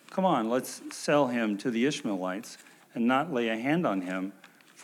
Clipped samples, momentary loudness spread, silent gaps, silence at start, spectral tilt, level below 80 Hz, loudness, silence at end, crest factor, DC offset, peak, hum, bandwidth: under 0.1%; 13 LU; none; 0.1 s; -5 dB/octave; under -90 dBFS; -29 LUFS; 0 s; 18 dB; under 0.1%; -12 dBFS; none; 16 kHz